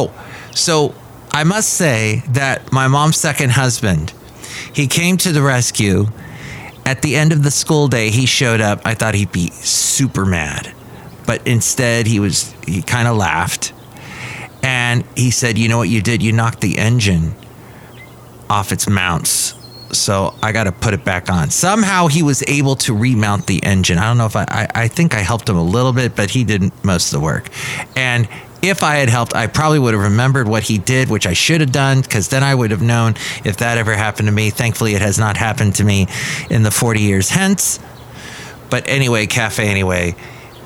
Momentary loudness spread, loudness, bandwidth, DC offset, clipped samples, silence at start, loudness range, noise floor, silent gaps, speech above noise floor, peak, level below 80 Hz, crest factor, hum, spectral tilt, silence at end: 9 LU; -15 LUFS; 17 kHz; under 0.1%; under 0.1%; 0 s; 3 LU; -37 dBFS; none; 22 dB; 0 dBFS; -40 dBFS; 16 dB; none; -4.5 dB/octave; 0 s